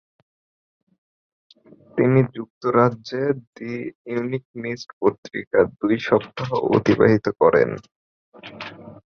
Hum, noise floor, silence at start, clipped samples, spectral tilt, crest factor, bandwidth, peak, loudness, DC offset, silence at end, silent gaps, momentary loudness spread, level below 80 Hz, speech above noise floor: none; under -90 dBFS; 1.95 s; under 0.1%; -8 dB/octave; 20 dB; 6.8 kHz; -2 dBFS; -21 LUFS; under 0.1%; 0.1 s; 2.50-2.61 s, 3.47-3.53 s, 3.95-4.05 s, 4.45-4.54 s, 4.93-5.01 s, 5.18-5.23 s, 5.47-5.51 s, 7.96-8.32 s; 15 LU; -56 dBFS; over 69 dB